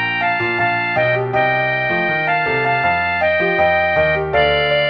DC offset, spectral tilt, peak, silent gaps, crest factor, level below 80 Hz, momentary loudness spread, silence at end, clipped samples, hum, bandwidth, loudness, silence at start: under 0.1%; -7 dB/octave; -4 dBFS; none; 12 dB; -42 dBFS; 2 LU; 0 s; under 0.1%; none; 6 kHz; -16 LUFS; 0 s